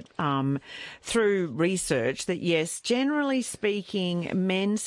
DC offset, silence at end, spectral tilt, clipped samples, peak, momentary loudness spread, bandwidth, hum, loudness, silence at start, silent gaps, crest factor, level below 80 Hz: under 0.1%; 0 s; -4.5 dB/octave; under 0.1%; -12 dBFS; 4 LU; 11.5 kHz; none; -27 LUFS; 0 s; none; 14 dB; -60 dBFS